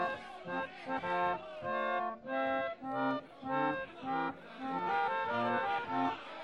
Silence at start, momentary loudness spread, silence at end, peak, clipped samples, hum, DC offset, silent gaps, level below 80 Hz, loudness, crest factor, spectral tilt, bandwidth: 0 s; 7 LU; 0 s; -20 dBFS; under 0.1%; none; under 0.1%; none; -72 dBFS; -36 LUFS; 16 dB; -6.5 dB/octave; 10 kHz